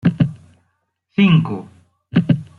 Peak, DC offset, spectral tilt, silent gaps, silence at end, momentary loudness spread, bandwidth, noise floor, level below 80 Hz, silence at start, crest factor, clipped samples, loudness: -2 dBFS; under 0.1%; -9 dB/octave; none; 0.15 s; 12 LU; 4.6 kHz; -69 dBFS; -52 dBFS; 0.05 s; 16 dB; under 0.1%; -17 LUFS